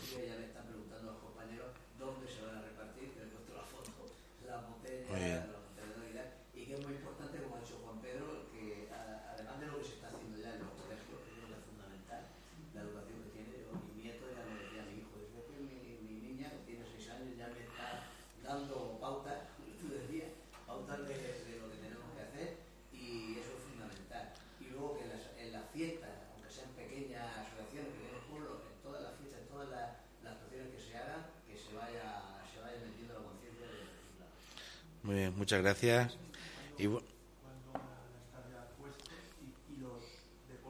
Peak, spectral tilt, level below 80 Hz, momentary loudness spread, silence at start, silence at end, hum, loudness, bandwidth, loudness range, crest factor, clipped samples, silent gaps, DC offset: -16 dBFS; -5 dB/octave; -64 dBFS; 13 LU; 0 s; 0 s; none; -46 LUFS; over 20 kHz; 14 LU; 30 dB; under 0.1%; none; under 0.1%